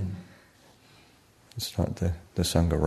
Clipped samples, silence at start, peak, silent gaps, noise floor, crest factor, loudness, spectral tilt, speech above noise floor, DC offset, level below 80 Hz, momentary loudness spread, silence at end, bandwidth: under 0.1%; 0 s; -8 dBFS; none; -59 dBFS; 22 dB; -29 LUFS; -5.5 dB/octave; 32 dB; under 0.1%; -42 dBFS; 15 LU; 0 s; 13.5 kHz